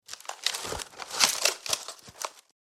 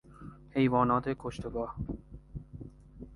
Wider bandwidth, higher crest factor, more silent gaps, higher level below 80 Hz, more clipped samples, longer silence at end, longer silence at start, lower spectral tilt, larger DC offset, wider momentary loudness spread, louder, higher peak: first, 16 kHz vs 11 kHz; first, 30 dB vs 22 dB; neither; second, -60 dBFS vs -50 dBFS; neither; first, 0.35 s vs 0 s; about the same, 0.1 s vs 0.1 s; second, 1 dB/octave vs -8 dB/octave; neither; second, 16 LU vs 23 LU; first, -28 LUFS vs -31 LUFS; first, -2 dBFS vs -12 dBFS